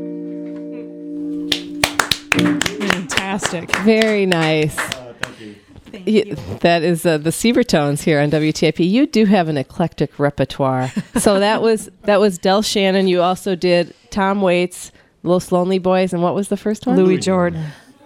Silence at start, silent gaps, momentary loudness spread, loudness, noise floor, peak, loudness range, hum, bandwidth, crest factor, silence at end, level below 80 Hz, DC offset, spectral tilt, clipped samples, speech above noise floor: 0 s; none; 13 LU; -17 LUFS; -38 dBFS; 0 dBFS; 3 LU; none; 19 kHz; 18 dB; 0.3 s; -48 dBFS; under 0.1%; -5 dB/octave; under 0.1%; 22 dB